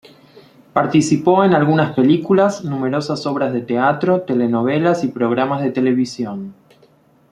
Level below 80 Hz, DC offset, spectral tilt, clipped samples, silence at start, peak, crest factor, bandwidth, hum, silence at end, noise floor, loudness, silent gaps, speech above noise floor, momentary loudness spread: -60 dBFS; under 0.1%; -6.5 dB/octave; under 0.1%; 0.35 s; 0 dBFS; 16 dB; 11 kHz; none; 0.8 s; -52 dBFS; -17 LUFS; none; 37 dB; 9 LU